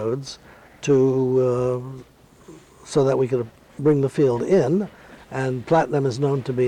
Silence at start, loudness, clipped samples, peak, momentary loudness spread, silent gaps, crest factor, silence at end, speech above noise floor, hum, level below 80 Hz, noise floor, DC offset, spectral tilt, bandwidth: 0 s; -21 LUFS; under 0.1%; -8 dBFS; 15 LU; none; 14 dB; 0 s; 26 dB; none; -56 dBFS; -46 dBFS; under 0.1%; -7.5 dB/octave; 10.5 kHz